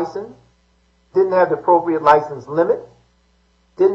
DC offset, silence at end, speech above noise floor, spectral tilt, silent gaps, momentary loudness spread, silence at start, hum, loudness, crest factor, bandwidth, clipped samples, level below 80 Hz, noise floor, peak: under 0.1%; 0 s; 42 dB; -7.5 dB/octave; none; 12 LU; 0 s; none; -17 LUFS; 18 dB; 7.2 kHz; under 0.1%; -60 dBFS; -59 dBFS; 0 dBFS